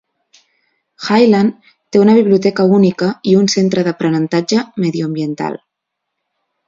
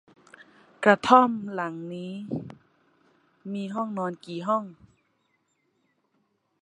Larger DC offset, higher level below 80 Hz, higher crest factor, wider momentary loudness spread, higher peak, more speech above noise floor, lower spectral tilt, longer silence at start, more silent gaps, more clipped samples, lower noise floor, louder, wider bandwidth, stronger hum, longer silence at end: neither; first, -58 dBFS vs -70 dBFS; second, 14 dB vs 26 dB; second, 10 LU vs 18 LU; about the same, 0 dBFS vs -2 dBFS; first, 64 dB vs 47 dB; about the same, -6 dB/octave vs -6 dB/octave; first, 1 s vs 0.8 s; neither; neither; first, -77 dBFS vs -72 dBFS; first, -13 LUFS vs -25 LUFS; second, 7.6 kHz vs 10.5 kHz; neither; second, 1.1 s vs 1.9 s